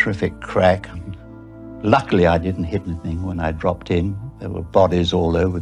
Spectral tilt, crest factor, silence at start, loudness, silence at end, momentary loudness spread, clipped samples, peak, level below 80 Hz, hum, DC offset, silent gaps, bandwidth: -7.5 dB/octave; 18 dB; 0 s; -20 LUFS; 0 s; 17 LU; under 0.1%; -2 dBFS; -36 dBFS; none; under 0.1%; none; 10 kHz